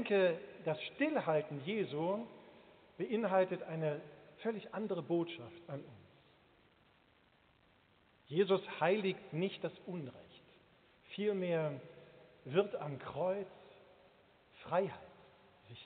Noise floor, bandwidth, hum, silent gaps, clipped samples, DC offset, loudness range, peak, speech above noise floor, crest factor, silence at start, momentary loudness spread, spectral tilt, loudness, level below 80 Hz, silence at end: -70 dBFS; 4.6 kHz; none; none; under 0.1%; under 0.1%; 6 LU; -18 dBFS; 33 dB; 20 dB; 0 s; 20 LU; -5 dB/octave; -38 LUFS; -80 dBFS; 0 s